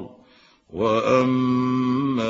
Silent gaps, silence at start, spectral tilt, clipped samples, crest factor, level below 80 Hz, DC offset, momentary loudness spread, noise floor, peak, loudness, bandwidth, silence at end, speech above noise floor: none; 0 s; -7 dB/octave; under 0.1%; 16 dB; -58 dBFS; under 0.1%; 13 LU; -55 dBFS; -6 dBFS; -21 LUFS; 7.4 kHz; 0 s; 35 dB